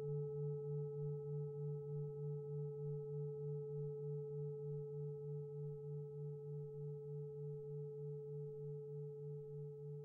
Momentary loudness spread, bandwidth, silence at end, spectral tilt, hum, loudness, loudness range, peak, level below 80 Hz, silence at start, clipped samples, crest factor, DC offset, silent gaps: 5 LU; 1.4 kHz; 0 s; -15 dB/octave; none; -48 LUFS; 3 LU; -36 dBFS; -80 dBFS; 0 s; under 0.1%; 10 dB; under 0.1%; none